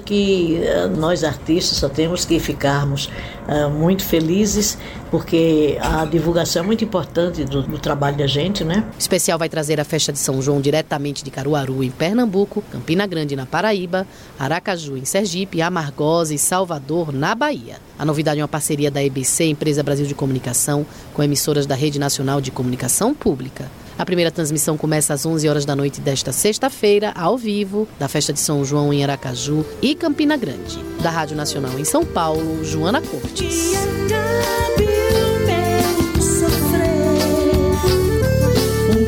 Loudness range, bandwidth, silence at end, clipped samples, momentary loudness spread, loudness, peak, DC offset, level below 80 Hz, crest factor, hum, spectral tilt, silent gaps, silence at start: 3 LU; 17 kHz; 0 s; under 0.1%; 6 LU; -19 LUFS; -6 dBFS; under 0.1%; -34 dBFS; 14 dB; none; -4.5 dB/octave; none; 0 s